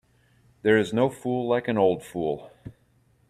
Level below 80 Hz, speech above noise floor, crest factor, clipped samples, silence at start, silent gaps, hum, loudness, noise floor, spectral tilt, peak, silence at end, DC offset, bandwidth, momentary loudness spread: -62 dBFS; 39 dB; 20 dB; under 0.1%; 0.65 s; none; none; -25 LUFS; -63 dBFS; -6.5 dB/octave; -8 dBFS; 0.6 s; under 0.1%; 14 kHz; 9 LU